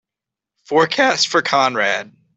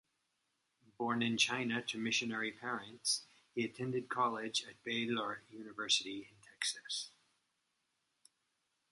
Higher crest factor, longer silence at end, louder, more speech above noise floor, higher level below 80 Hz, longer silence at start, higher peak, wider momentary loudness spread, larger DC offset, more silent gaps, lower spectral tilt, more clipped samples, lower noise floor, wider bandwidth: second, 16 dB vs 24 dB; second, 0.3 s vs 1.8 s; first, -16 LUFS vs -37 LUFS; first, 69 dB vs 45 dB; first, -66 dBFS vs -82 dBFS; second, 0.7 s vs 1 s; first, -2 dBFS vs -18 dBFS; second, 5 LU vs 12 LU; neither; neither; about the same, -2.5 dB/octave vs -2.5 dB/octave; neither; about the same, -86 dBFS vs -83 dBFS; second, 8.4 kHz vs 11.5 kHz